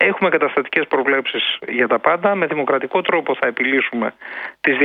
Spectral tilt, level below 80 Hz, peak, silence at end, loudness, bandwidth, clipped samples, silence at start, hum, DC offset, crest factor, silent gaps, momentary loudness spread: -7 dB/octave; -66 dBFS; 0 dBFS; 0 s; -18 LUFS; 5 kHz; under 0.1%; 0 s; none; under 0.1%; 18 dB; none; 5 LU